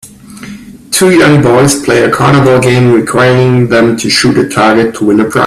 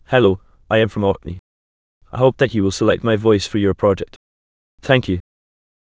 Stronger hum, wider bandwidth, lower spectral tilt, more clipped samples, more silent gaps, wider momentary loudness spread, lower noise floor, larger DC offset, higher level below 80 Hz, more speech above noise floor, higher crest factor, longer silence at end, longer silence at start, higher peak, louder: neither; first, 15 kHz vs 8 kHz; second, -5 dB/octave vs -6.5 dB/octave; first, 0.1% vs under 0.1%; second, none vs 1.39-2.01 s, 4.16-4.78 s; second, 4 LU vs 15 LU; second, -28 dBFS vs under -90 dBFS; neither; about the same, -40 dBFS vs -40 dBFS; second, 21 dB vs over 74 dB; second, 8 dB vs 18 dB; second, 0 s vs 0.6 s; about the same, 0.05 s vs 0.1 s; about the same, 0 dBFS vs 0 dBFS; first, -7 LUFS vs -18 LUFS